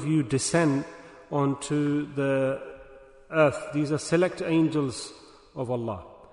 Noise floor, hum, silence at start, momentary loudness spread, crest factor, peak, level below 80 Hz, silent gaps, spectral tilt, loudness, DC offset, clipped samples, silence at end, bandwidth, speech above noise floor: -50 dBFS; none; 0 s; 15 LU; 18 dB; -8 dBFS; -60 dBFS; none; -5.5 dB/octave; -26 LUFS; under 0.1%; under 0.1%; 0.1 s; 10.5 kHz; 24 dB